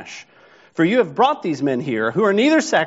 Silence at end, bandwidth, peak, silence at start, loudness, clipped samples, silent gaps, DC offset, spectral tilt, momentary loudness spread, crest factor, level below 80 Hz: 0 s; 8 kHz; -2 dBFS; 0 s; -18 LUFS; under 0.1%; none; under 0.1%; -4 dB/octave; 15 LU; 16 dB; -68 dBFS